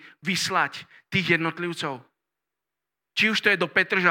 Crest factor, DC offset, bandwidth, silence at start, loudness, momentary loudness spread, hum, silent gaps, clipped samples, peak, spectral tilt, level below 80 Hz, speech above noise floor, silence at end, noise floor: 22 dB; under 0.1%; 17.5 kHz; 0.05 s; -24 LUFS; 11 LU; none; none; under 0.1%; -4 dBFS; -3.5 dB/octave; -68 dBFS; 62 dB; 0 s; -87 dBFS